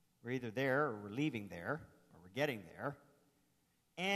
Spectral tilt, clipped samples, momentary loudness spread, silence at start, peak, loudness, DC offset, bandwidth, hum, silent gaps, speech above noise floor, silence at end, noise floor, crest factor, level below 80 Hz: -5.5 dB/octave; under 0.1%; 11 LU; 0.25 s; -22 dBFS; -41 LUFS; under 0.1%; 14 kHz; none; none; 38 dB; 0 s; -78 dBFS; 20 dB; -78 dBFS